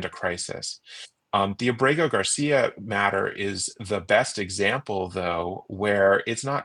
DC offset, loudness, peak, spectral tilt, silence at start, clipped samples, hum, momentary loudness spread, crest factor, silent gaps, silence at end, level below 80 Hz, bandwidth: under 0.1%; -24 LUFS; -6 dBFS; -3.5 dB/octave; 0 s; under 0.1%; none; 10 LU; 20 dB; none; 0 s; -64 dBFS; 11.5 kHz